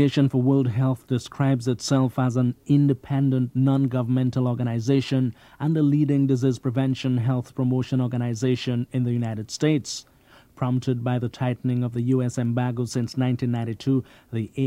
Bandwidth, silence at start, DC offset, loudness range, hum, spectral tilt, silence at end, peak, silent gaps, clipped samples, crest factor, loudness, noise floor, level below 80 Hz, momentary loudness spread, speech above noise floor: 11 kHz; 0 s; under 0.1%; 3 LU; none; -7.5 dB/octave; 0 s; -8 dBFS; none; under 0.1%; 16 dB; -24 LUFS; -53 dBFS; -60 dBFS; 6 LU; 31 dB